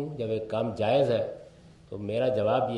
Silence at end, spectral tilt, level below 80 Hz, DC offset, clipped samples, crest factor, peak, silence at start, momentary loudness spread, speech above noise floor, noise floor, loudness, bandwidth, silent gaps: 0 s; -7.5 dB/octave; -62 dBFS; under 0.1%; under 0.1%; 16 dB; -12 dBFS; 0 s; 14 LU; 25 dB; -52 dBFS; -28 LUFS; 11 kHz; none